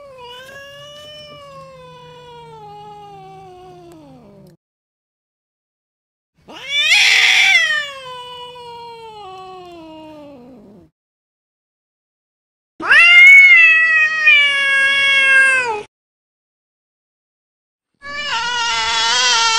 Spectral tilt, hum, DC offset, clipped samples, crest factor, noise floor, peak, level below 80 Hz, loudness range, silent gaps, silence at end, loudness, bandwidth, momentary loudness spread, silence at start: 1 dB/octave; none; under 0.1%; under 0.1%; 16 dB; -42 dBFS; 0 dBFS; -58 dBFS; 14 LU; 4.57-6.33 s, 10.92-12.79 s, 15.88-17.79 s; 0 s; -9 LUFS; 16 kHz; 26 LU; 0.2 s